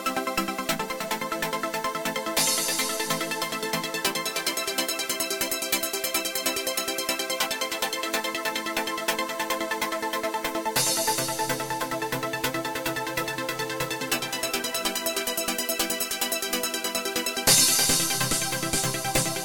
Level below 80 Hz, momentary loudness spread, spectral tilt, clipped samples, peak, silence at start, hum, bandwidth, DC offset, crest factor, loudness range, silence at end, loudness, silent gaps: -54 dBFS; 6 LU; -1.5 dB/octave; under 0.1%; -6 dBFS; 0 s; none; 17.5 kHz; under 0.1%; 22 dB; 5 LU; 0 s; -25 LUFS; none